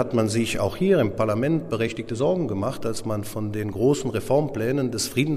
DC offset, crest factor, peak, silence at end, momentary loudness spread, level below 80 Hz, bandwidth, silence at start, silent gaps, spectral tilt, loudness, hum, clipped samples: under 0.1%; 16 dB; -8 dBFS; 0 s; 8 LU; -48 dBFS; 15.5 kHz; 0 s; none; -6 dB/octave; -24 LUFS; none; under 0.1%